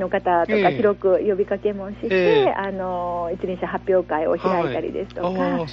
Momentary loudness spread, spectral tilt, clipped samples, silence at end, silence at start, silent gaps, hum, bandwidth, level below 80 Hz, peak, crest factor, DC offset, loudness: 9 LU; -4.5 dB/octave; under 0.1%; 0 s; 0 s; none; 60 Hz at -40 dBFS; 6.8 kHz; -48 dBFS; -4 dBFS; 16 dB; under 0.1%; -21 LUFS